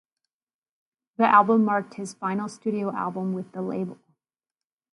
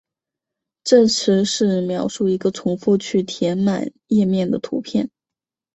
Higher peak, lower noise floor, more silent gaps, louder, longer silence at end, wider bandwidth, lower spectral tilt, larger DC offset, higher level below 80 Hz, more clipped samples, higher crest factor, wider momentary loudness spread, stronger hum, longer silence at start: about the same, -4 dBFS vs -2 dBFS; about the same, under -90 dBFS vs -88 dBFS; neither; second, -24 LUFS vs -19 LUFS; first, 1 s vs 0.7 s; first, 11.5 kHz vs 8.2 kHz; about the same, -6.5 dB/octave vs -5.5 dB/octave; neither; second, -76 dBFS vs -60 dBFS; neither; about the same, 22 dB vs 18 dB; first, 14 LU vs 9 LU; neither; first, 1.2 s vs 0.85 s